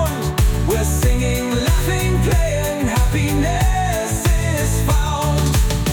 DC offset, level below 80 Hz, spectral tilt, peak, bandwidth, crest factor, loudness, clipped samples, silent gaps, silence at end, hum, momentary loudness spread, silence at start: under 0.1%; -20 dBFS; -5 dB/octave; -6 dBFS; 19.5 kHz; 10 dB; -18 LUFS; under 0.1%; none; 0 s; none; 2 LU; 0 s